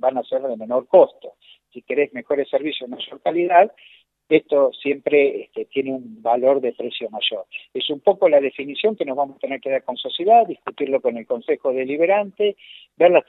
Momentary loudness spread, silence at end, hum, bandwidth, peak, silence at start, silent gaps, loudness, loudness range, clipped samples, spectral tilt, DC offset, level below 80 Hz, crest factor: 12 LU; 0.05 s; none; 4.1 kHz; 0 dBFS; 0.05 s; none; -20 LUFS; 2 LU; under 0.1%; -7.5 dB/octave; under 0.1%; -78 dBFS; 20 dB